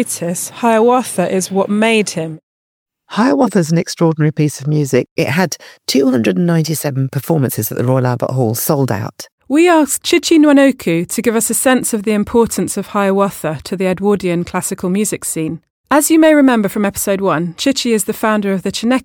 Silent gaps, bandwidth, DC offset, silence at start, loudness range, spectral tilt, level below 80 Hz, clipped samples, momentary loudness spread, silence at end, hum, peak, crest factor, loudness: 2.43-2.86 s, 5.11-5.16 s, 9.32-9.38 s, 15.70-15.84 s; 19.5 kHz; under 0.1%; 0 s; 3 LU; -5 dB/octave; -50 dBFS; under 0.1%; 8 LU; 0 s; none; 0 dBFS; 14 dB; -14 LUFS